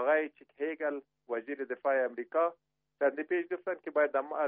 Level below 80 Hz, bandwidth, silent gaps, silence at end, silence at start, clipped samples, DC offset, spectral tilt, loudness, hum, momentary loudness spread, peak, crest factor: -88 dBFS; 3.7 kHz; none; 0 s; 0 s; under 0.1%; under 0.1%; -2 dB/octave; -33 LUFS; none; 9 LU; -16 dBFS; 16 dB